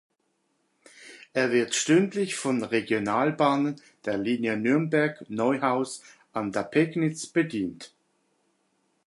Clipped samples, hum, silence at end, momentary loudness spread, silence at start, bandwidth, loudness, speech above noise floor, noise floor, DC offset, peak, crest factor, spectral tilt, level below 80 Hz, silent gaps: under 0.1%; none; 1.2 s; 10 LU; 1 s; 11.5 kHz; -26 LUFS; 48 dB; -74 dBFS; under 0.1%; -8 dBFS; 20 dB; -5 dB/octave; -70 dBFS; none